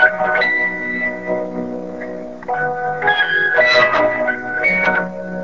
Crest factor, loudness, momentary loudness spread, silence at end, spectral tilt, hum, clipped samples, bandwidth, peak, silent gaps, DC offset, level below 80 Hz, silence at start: 16 dB; -16 LUFS; 15 LU; 0 s; -4.5 dB/octave; none; under 0.1%; 7.4 kHz; 0 dBFS; none; 0.8%; -52 dBFS; 0 s